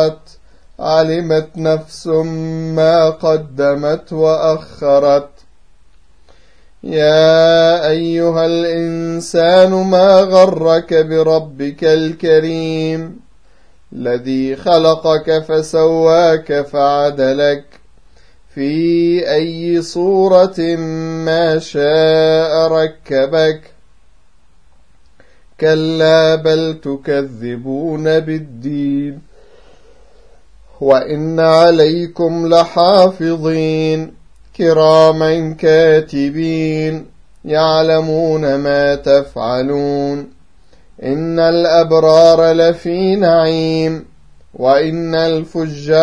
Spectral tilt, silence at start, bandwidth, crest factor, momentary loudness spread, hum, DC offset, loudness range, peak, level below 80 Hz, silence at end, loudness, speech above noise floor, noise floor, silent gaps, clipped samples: -6 dB/octave; 0 s; 10.5 kHz; 14 dB; 11 LU; none; 0.8%; 5 LU; 0 dBFS; -48 dBFS; 0 s; -13 LUFS; 40 dB; -52 dBFS; none; under 0.1%